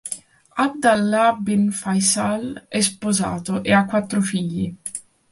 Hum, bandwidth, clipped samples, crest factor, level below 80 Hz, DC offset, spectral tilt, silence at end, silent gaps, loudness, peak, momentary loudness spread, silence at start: none; 11.5 kHz; under 0.1%; 18 dB; -54 dBFS; under 0.1%; -4 dB/octave; 0.3 s; none; -20 LUFS; -2 dBFS; 13 LU; 0.05 s